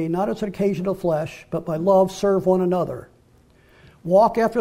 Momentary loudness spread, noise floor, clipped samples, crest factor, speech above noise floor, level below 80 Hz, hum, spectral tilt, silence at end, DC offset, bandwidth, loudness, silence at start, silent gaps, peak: 12 LU; -55 dBFS; under 0.1%; 16 dB; 35 dB; -52 dBFS; none; -7.5 dB/octave; 0 s; under 0.1%; 15.5 kHz; -21 LUFS; 0 s; none; -6 dBFS